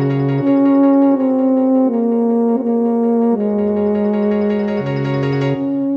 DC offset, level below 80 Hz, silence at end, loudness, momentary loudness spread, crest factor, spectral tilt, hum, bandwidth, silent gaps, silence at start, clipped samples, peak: under 0.1%; -56 dBFS; 0 s; -15 LUFS; 6 LU; 12 dB; -10 dB/octave; none; 5.6 kHz; none; 0 s; under 0.1%; -2 dBFS